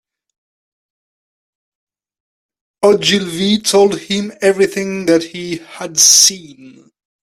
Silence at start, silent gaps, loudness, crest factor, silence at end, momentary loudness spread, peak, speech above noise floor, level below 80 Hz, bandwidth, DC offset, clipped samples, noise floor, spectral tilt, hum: 2.8 s; none; -12 LUFS; 16 dB; 0.55 s; 17 LU; 0 dBFS; over 76 dB; -58 dBFS; 16 kHz; under 0.1%; under 0.1%; under -90 dBFS; -2 dB/octave; none